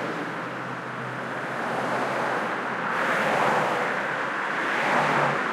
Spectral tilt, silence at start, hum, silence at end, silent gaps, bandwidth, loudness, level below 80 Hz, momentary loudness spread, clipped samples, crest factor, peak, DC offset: -4.5 dB/octave; 0 s; none; 0 s; none; 16.5 kHz; -26 LUFS; -70 dBFS; 9 LU; under 0.1%; 18 dB; -8 dBFS; under 0.1%